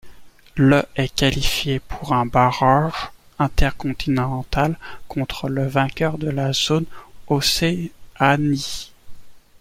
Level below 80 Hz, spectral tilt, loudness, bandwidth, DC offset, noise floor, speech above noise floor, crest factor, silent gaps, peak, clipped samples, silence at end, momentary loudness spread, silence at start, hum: -32 dBFS; -5 dB/octave; -20 LUFS; 16.5 kHz; under 0.1%; -40 dBFS; 21 dB; 18 dB; none; -2 dBFS; under 0.1%; 0.2 s; 13 LU; 0.05 s; none